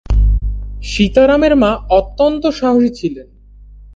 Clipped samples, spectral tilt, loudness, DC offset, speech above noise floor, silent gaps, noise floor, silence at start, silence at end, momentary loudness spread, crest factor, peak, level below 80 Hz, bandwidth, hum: under 0.1%; -6.5 dB/octave; -14 LUFS; under 0.1%; 26 dB; none; -38 dBFS; 0.1 s; 0.1 s; 13 LU; 14 dB; 0 dBFS; -20 dBFS; 7.8 kHz; 50 Hz at -30 dBFS